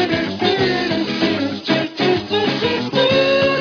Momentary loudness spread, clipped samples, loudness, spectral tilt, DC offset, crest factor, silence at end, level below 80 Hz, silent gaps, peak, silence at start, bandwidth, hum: 5 LU; under 0.1%; -17 LUFS; -5.5 dB/octave; under 0.1%; 16 dB; 0 s; -50 dBFS; none; -2 dBFS; 0 s; 5.4 kHz; none